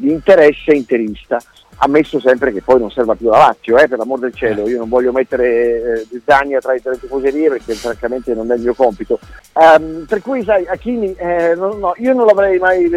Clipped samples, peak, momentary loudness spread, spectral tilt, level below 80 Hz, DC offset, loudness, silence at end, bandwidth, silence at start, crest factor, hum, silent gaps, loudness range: under 0.1%; 0 dBFS; 11 LU; -6 dB/octave; -42 dBFS; under 0.1%; -14 LUFS; 0 s; 13 kHz; 0 s; 14 dB; none; none; 3 LU